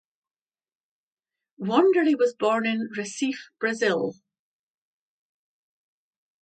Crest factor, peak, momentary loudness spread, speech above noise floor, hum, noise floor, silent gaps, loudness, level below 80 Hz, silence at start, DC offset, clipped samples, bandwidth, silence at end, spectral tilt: 22 dB; -6 dBFS; 10 LU; over 66 dB; none; under -90 dBFS; none; -24 LUFS; -80 dBFS; 1.6 s; under 0.1%; under 0.1%; 9.2 kHz; 2.3 s; -4.5 dB/octave